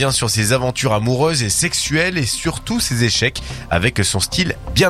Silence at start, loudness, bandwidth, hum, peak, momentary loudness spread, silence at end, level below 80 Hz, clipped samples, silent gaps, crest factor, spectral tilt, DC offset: 0 s; -17 LUFS; 16 kHz; none; 0 dBFS; 4 LU; 0 s; -34 dBFS; under 0.1%; none; 16 dB; -3.5 dB/octave; under 0.1%